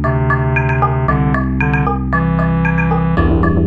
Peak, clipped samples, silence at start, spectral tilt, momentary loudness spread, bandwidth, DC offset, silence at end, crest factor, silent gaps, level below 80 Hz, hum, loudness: -2 dBFS; under 0.1%; 0 s; -10 dB/octave; 2 LU; 4.7 kHz; under 0.1%; 0 s; 12 dB; none; -22 dBFS; none; -15 LUFS